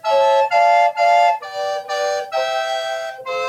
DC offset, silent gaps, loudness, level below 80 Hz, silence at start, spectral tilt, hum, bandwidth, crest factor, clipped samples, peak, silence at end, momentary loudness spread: under 0.1%; none; -17 LUFS; -78 dBFS; 0.05 s; 0 dB/octave; none; 14.5 kHz; 12 dB; under 0.1%; -4 dBFS; 0 s; 10 LU